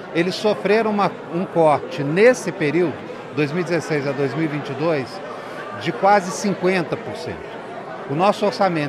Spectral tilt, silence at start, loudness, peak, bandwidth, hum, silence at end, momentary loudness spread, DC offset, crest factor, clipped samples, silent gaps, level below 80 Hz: -5.5 dB/octave; 0 s; -20 LUFS; -2 dBFS; 14 kHz; none; 0 s; 15 LU; under 0.1%; 18 dB; under 0.1%; none; -62 dBFS